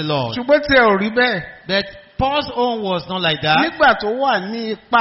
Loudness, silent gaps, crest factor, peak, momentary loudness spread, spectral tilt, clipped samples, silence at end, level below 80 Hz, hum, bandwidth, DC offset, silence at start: -17 LUFS; none; 14 dB; -2 dBFS; 9 LU; -2 dB/octave; under 0.1%; 0 s; -44 dBFS; none; 6 kHz; under 0.1%; 0 s